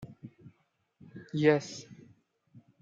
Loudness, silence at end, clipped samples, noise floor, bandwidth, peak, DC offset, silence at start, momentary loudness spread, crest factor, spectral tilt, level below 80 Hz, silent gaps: -29 LUFS; 0.85 s; under 0.1%; -73 dBFS; 7.8 kHz; -10 dBFS; under 0.1%; 0 s; 26 LU; 24 dB; -6 dB/octave; -74 dBFS; none